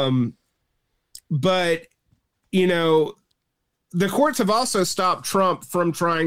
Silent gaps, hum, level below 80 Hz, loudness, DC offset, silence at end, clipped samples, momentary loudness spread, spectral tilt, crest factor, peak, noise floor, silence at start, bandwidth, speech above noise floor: none; none; -62 dBFS; -21 LUFS; under 0.1%; 0 s; under 0.1%; 8 LU; -5 dB/octave; 14 dB; -8 dBFS; -77 dBFS; 0 s; 16.5 kHz; 56 dB